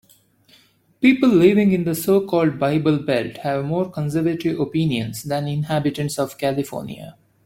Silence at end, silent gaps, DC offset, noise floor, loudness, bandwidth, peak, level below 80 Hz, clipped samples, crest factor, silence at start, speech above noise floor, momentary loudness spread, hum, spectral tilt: 0.35 s; none; under 0.1%; -56 dBFS; -20 LUFS; 17 kHz; -2 dBFS; -56 dBFS; under 0.1%; 18 dB; 1 s; 36 dB; 11 LU; none; -6.5 dB/octave